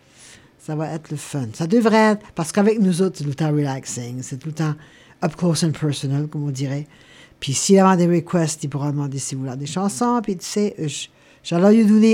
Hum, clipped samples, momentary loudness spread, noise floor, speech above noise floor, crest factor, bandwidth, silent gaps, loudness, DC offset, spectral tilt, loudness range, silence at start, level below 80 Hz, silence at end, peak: none; under 0.1%; 15 LU; -47 dBFS; 28 dB; 18 dB; 15.5 kHz; none; -20 LUFS; under 0.1%; -5.5 dB/octave; 5 LU; 0.7 s; -60 dBFS; 0 s; -2 dBFS